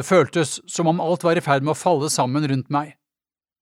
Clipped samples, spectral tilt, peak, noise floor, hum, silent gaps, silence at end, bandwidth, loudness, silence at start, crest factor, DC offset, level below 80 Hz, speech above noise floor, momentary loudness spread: under 0.1%; -5 dB/octave; -2 dBFS; under -90 dBFS; none; none; 0.7 s; 16 kHz; -21 LUFS; 0 s; 18 dB; under 0.1%; -68 dBFS; over 70 dB; 6 LU